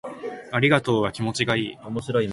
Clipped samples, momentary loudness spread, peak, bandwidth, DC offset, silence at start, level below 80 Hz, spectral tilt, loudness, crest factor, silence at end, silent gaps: under 0.1%; 13 LU; -6 dBFS; 11.5 kHz; under 0.1%; 0.05 s; -54 dBFS; -5.5 dB/octave; -23 LUFS; 18 dB; 0 s; none